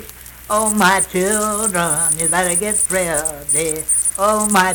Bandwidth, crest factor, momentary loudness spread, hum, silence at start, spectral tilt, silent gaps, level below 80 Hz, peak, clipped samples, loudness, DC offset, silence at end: 19.5 kHz; 16 dB; 5 LU; none; 0 s; -2.5 dB/octave; none; -42 dBFS; 0 dBFS; under 0.1%; -15 LUFS; under 0.1%; 0 s